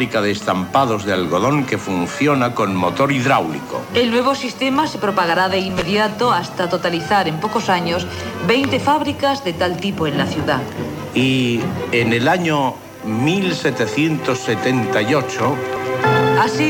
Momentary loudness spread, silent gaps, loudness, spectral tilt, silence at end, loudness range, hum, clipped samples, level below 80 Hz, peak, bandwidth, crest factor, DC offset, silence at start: 5 LU; none; -18 LUFS; -5.5 dB/octave; 0 s; 1 LU; none; under 0.1%; -50 dBFS; -2 dBFS; 19 kHz; 16 dB; under 0.1%; 0 s